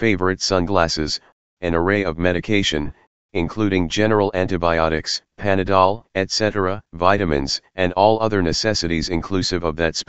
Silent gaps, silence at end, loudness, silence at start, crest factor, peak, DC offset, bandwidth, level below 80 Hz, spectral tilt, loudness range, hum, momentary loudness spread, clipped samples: 1.32-1.57 s, 3.07-3.29 s; 0 s; -20 LUFS; 0 s; 20 dB; 0 dBFS; 2%; 8.2 kHz; -38 dBFS; -4.5 dB/octave; 2 LU; none; 8 LU; under 0.1%